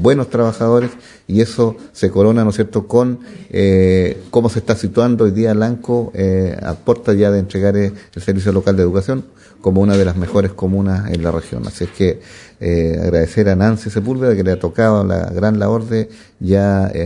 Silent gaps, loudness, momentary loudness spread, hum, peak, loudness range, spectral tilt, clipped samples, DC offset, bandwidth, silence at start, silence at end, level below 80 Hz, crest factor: none; -15 LUFS; 8 LU; none; 0 dBFS; 2 LU; -8 dB/octave; under 0.1%; under 0.1%; 11 kHz; 0 s; 0 s; -42 dBFS; 14 dB